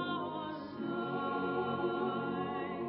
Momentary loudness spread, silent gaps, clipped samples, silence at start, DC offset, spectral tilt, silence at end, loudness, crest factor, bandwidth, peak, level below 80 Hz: 6 LU; none; under 0.1%; 0 s; under 0.1%; -5 dB/octave; 0 s; -37 LUFS; 14 dB; 5.6 kHz; -24 dBFS; -68 dBFS